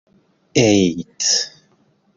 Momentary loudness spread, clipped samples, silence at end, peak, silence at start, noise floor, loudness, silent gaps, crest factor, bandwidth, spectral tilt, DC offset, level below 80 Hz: 7 LU; under 0.1%; 0.7 s; -2 dBFS; 0.55 s; -59 dBFS; -17 LUFS; none; 18 dB; 7.6 kHz; -3.5 dB/octave; under 0.1%; -52 dBFS